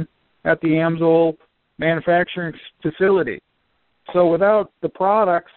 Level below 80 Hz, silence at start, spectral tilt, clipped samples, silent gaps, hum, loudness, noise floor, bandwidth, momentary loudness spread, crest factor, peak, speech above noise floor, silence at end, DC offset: -56 dBFS; 0 s; -5.5 dB/octave; under 0.1%; none; none; -19 LUFS; -67 dBFS; 4.3 kHz; 12 LU; 16 dB; -4 dBFS; 49 dB; 0.15 s; under 0.1%